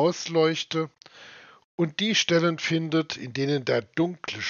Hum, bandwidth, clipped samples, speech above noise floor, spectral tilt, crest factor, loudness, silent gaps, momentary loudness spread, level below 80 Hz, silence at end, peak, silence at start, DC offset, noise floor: none; 7.2 kHz; under 0.1%; 23 dB; -4 dB/octave; 18 dB; -25 LUFS; 1.64-1.78 s; 11 LU; -72 dBFS; 0 s; -8 dBFS; 0 s; under 0.1%; -49 dBFS